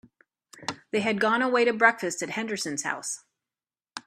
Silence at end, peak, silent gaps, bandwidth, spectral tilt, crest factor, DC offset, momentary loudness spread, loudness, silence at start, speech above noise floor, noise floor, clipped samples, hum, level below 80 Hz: 0.05 s; -4 dBFS; none; 14.5 kHz; -3 dB/octave; 24 dB; under 0.1%; 15 LU; -25 LUFS; 0.55 s; over 64 dB; under -90 dBFS; under 0.1%; none; -74 dBFS